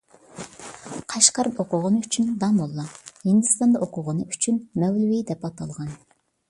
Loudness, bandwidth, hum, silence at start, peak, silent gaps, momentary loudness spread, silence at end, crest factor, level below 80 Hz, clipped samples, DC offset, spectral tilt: -22 LUFS; 11.5 kHz; none; 0.35 s; 0 dBFS; none; 19 LU; 0.55 s; 24 dB; -62 dBFS; under 0.1%; under 0.1%; -4.5 dB/octave